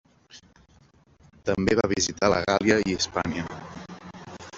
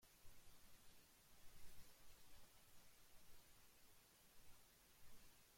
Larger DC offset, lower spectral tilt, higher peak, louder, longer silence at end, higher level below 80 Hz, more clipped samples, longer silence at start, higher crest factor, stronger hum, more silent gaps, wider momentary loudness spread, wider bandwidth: neither; first, -4 dB/octave vs -2 dB/octave; first, -4 dBFS vs -46 dBFS; first, -24 LUFS vs -69 LUFS; about the same, 0 s vs 0 s; first, -52 dBFS vs -74 dBFS; neither; first, 0.35 s vs 0 s; first, 24 dB vs 16 dB; neither; neither; first, 20 LU vs 2 LU; second, 8 kHz vs 16.5 kHz